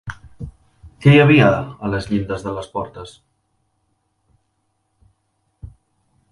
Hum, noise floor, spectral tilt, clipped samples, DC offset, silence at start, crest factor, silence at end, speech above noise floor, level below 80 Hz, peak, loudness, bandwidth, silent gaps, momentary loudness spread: none; -69 dBFS; -7.5 dB/octave; under 0.1%; under 0.1%; 0.05 s; 20 dB; 0.65 s; 53 dB; -44 dBFS; 0 dBFS; -16 LUFS; 11 kHz; none; 26 LU